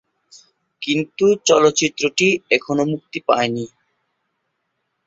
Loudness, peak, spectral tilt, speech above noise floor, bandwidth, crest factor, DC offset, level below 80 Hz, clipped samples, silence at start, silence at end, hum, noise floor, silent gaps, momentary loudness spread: -18 LUFS; 0 dBFS; -3.5 dB/octave; 56 dB; 8 kHz; 20 dB; under 0.1%; -62 dBFS; under 0.1%; 0.8 s; 1.4 s; none; -73 dBFS; none; 10 LU